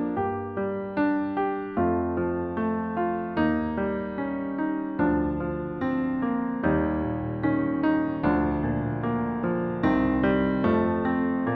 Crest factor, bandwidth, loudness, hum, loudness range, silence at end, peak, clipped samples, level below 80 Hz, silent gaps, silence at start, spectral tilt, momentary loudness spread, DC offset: 16 dB; 4.9 kHz; -26 LUFS; none; 2 LU; 0 s; -10 dBFS; under 0.1%; -44 dBFS; none; 0 s; -10.5 dB/octave; 6 LU; under 0.1%